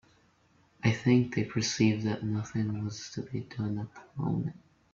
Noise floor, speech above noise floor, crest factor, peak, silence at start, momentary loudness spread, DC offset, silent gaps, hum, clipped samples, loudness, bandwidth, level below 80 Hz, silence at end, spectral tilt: -66 dBFS; 36 dB; 20 dB; -12 dBFS; 0.85 s; 12 LU; under 0.1%; none; none; under 0.1%; -31 LUFS; 7.6 kHz; -62 dBFS; 0.35 s; -6 dB/octave